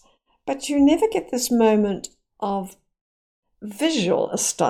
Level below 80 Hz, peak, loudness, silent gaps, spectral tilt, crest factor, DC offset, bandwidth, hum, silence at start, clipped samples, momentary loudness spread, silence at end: -54 dBFS; -6 dBFS; -21 LUFS; 3.01-3.43 s; -4 dB/octave; 16 dB; under 0.1%; 16.5 kHz; none; 0.45 s; under 0.1%; 19 LU; 0 s